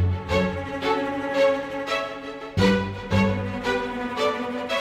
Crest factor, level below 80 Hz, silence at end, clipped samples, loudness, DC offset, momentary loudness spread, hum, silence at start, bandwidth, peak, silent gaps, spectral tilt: 18 dB; -46 dBFS; 0 s; under 0.1%; -25 LUFS; under 0.1%; 7 LU; none; 0 s; 14 kHz; -6 dBFS; none; -6 dB/octave